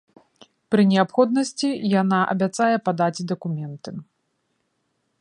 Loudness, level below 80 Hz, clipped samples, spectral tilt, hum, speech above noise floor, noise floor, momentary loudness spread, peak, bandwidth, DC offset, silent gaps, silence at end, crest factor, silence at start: -21 LUFS; -70 dBFS; under 0.1%; -6 dB/octave; none; 51 dB; -72 dBFS; 14 LU; -4 dBFS; 11 kHz; under 0.1%; none; 1.15 s; 20 dB; 0.7 s